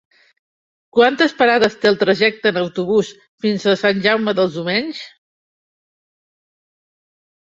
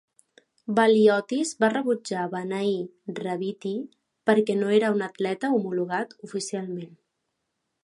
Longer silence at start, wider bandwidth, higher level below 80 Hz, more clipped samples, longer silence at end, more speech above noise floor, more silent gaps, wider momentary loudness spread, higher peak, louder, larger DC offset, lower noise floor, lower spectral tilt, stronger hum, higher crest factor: first, 0.95 s vs 0.7 s; second, 7.8 kHz vs 11.5 kHz; first, -62 dBFS vs -76 dBFS; neither; first, 2.5 s vs 1 s; first, over 74 dB vs 55 dB; first, 3.28-3.38 s vs none; second, 8 LU vs 14 LU; first, 0 dBFS vs -6 dBFS; first, -16 LUFS vs -25 LUFS; neither; first, under -90 dBFS vs -79 dBFS; about the same, -5 dB/octave vs -5 dB/octave; neither; about the same, 18 dB vs 20 dB